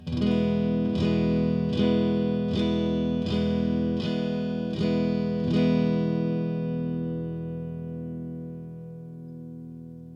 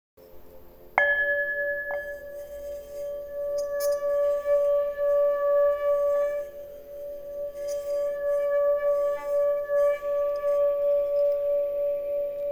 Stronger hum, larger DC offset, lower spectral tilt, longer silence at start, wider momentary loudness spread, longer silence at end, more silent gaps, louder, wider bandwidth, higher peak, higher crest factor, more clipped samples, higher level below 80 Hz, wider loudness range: neither; neither; first, -8.5 dB/octave vs -3 dB/octave; second, 0 s vs 0.2 s; first, 17 LU vs 14 LU; about the same, 0 s vs 0 s; neither; about the same, -26 LUFS vs -26 LUFS; second, 7.2 kHz vs 20 kHz; second, -12 dBFS vs -4 dBFS; second, 14 dB vs 22 dB; neither; first, -46 dBFS vs -56 dBFS; first, 8 LU vs 4 LU